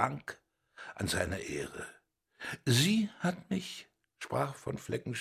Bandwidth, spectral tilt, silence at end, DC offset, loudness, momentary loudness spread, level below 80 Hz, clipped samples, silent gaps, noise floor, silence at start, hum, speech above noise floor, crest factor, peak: 16 kHz; -4.5 dB/octave; 0 s; under 0.1%; -34 LUFS; 19 LU; -56 dBFS; under 0.1%; none; -54 dBFS; 0 s; none; 20 dB; 24 dB; -10 dBFS